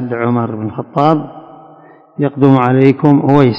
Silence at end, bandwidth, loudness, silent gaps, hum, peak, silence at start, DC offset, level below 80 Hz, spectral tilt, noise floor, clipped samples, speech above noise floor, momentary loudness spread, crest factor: 0 s; 5.8 kHz; -12 LUFS; none; none; 0 dBFS; 0 s; under 0.1%; -52 dBFS; -10 dB/octave; -41 dBFS; 0.8%; 30 dB; 11 LU; 12 dB